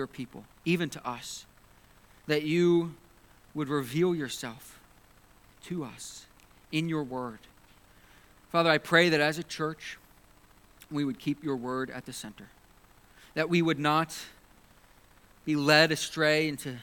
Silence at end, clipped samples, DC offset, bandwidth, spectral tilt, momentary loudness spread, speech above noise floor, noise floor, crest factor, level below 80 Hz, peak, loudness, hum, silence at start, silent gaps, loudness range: 0 s; under 0.1%; under 0.1%; 19 kHz; -5 dB/octave; 20 LU; 30 dB; -59 dBFS; 26 dB; -64 dBFS; -6 dBFS; -28 LUFS; none; 0 s; none; 9 LU